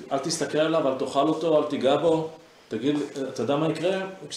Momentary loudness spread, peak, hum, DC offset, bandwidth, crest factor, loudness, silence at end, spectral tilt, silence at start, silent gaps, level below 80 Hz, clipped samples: 8 LU; -8 dBFS; none; under 0.1%; 13.5 kHz; 16 dB; -25 LUFS; 0 s; -5 dB/octave; 0 s; none; -68 dBFS; under 0.1%